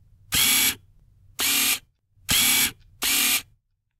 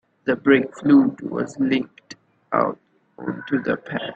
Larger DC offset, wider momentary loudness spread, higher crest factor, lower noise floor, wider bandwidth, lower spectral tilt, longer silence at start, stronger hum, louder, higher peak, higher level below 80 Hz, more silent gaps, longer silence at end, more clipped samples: neither; second, 10 LU vs 15 LU; about the same, 18 dB vs 18 dB; first, -65 dBFS vs -46 dBFS; first, 16 kHz vs 8 kHz; second, 0.5 dB/octave vs -7 dB/octave; about the same, 0.3 s vs 0.25 s; neither; about the same, -20 LUFS vs -21 LUFS; about the same, -6 dBFS vs -4 dBFS; first, -52 dBFS vs -64 dBFS; neither; first, 0.55 s vs 0 s; neither